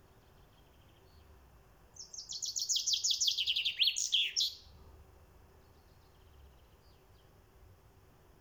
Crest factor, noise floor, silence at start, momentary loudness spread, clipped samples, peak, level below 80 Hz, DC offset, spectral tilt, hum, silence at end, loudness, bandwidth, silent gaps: 22 dB; -62 dBFS; 1.3 s; 18 LU; under 0.1%; -18 dBFS; -64 dBFS; under 0.1%; 2.5 dB/octave; none; 0.65 s; -31 LUFS; over 20 kHz; none